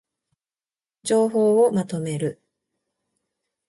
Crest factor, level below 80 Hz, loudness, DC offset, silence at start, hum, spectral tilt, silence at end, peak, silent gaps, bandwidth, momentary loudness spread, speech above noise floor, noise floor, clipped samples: 16 dB; -70 dBFS; -21 LUFS; under 0.1%; 1.05 s; none; -6 dB/octave; 1.35 s; -8 dBFS; none; 11.5 kHz; 11 LU; over 70 dB; under -90 dBFS; under 0.1%